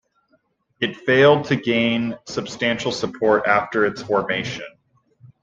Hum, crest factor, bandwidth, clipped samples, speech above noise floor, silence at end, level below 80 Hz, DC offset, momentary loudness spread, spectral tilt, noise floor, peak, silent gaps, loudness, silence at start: none; 18 dB; 7.8 kHz; under 0.1%; 45 dB; 0.75 s; -58 dBFS; under 0.1%; 13 LU; -5 dB/octave; -65 dBFS; -2 dBFS; none; -20 LUFS; 0.8 s